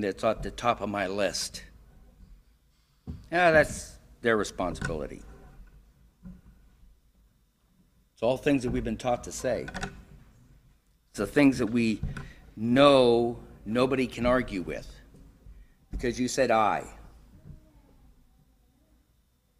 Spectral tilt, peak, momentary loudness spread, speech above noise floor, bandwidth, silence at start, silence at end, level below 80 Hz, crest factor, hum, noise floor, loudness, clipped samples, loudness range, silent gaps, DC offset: -5 dB/octave; -8 dBFS; 20 LU; 41 dB; 15.5 kHz; 0 s; 2.05 s; -48 dBFS; 22 dB; none; -68 dBFS; -27 LUFS; under 0.1%; 9 LU; none; under 0.1%